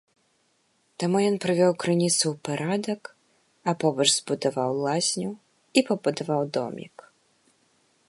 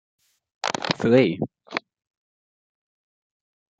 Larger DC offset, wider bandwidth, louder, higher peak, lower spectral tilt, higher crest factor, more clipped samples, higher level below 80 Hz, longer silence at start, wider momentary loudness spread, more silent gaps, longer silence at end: neither; first, 12 kHz vs 9.2 kHz; about the same, -25 LUFS vs -23 LUFS; about the same, -4 dBFS vs -2 dBFS; second, -4 dB/octave vs -5.5 dB/octave; about the same, 22 dB vs 24 dB; neither; second, -74 dBFS vs -64 dBFS; first, 1 s vs 0.65 s; about the same, 13 LU vs 14 LU; neither; second, 1.2 s vs 2 s